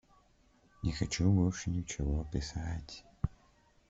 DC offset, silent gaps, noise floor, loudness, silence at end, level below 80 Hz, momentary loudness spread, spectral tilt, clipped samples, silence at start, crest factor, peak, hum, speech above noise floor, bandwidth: under 0.1%; none; -67 dBFS; -35 LUFS; 0.6 s; -46 dBFS; 11 LU; -6 dB/octave; under 0.1%; 0.8 s; 18 dB; -16 dBFS; none; 34 dB; 8 kHz